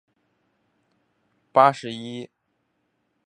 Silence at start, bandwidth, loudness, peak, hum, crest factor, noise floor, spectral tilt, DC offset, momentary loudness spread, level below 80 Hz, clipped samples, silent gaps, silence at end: 1.55 s; 10 kHz; -21 LUFS; -2 dBFS; none; 24 dB; -73 dBFS; -5.5 dB/octave; under 0.1%; 20 LU; -78 dBFS; under 0.1%; none; 1 s